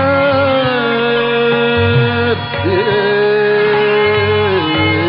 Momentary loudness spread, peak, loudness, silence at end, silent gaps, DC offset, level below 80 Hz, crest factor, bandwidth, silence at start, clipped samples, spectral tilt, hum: 2 LU; -2 dBFS; -13 LUFS; 0 s; none; under 0.1%; -44 dBFS; 10 dB; 5.4 kHz; 0 s; under 0.1%; -3.5 dB/octave; none